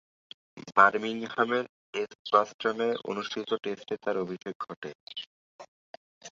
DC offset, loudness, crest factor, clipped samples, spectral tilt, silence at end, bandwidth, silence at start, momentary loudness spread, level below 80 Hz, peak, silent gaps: under 0.1%; -29 LUFS; 26 dB; under 0.1%; -4.5 dB/octave; 0.1 s; 7.6 kHz; 0.55 s; 19 LU; -78 dBFS; -4 dBFS; 1.69-1.93 s, 2.15-2.25 s, 2.54-2.59 s, 4.55-4.60 s, 4.77-4.82 s, 4.95-5.07 s, 5.27-5.59 s, 5.68-6.21 s